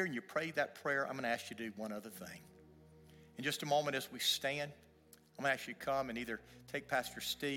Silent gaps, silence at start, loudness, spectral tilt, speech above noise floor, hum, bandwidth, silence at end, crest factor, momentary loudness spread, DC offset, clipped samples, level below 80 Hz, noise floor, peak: none; 0 s; -39 LUFS; -3 dB/octave; 25 dB; none; 17 kHz; 0 s; 20 dB; 12 LU; under 0.1%; under 0.1%; -74 dBFS; -65 dBFS; -20 dBFS